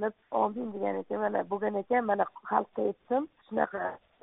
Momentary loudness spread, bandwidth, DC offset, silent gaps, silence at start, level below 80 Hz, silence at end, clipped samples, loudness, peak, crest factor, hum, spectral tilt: 5 LU; 3.9 kHz; under 0.1%; none; 0 s; -72 dBFS; 0.25 s; under 0.1%; -31 LUFS; -10 dBFS; 22 dB; none; -0.5 dB/octave